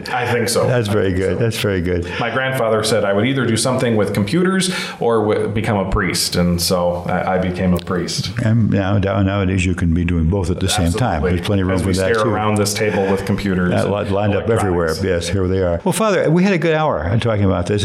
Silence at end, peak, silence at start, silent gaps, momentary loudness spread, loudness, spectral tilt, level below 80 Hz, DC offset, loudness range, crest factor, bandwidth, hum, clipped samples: 0 s; -6 dBFS; 0 s; none; 3 LU; -17 LUFS; -5.5 dB/octave; -34 dBFS; under 0.1%; 1 LU; 10 dB; 16 kHz; none; under 0.1%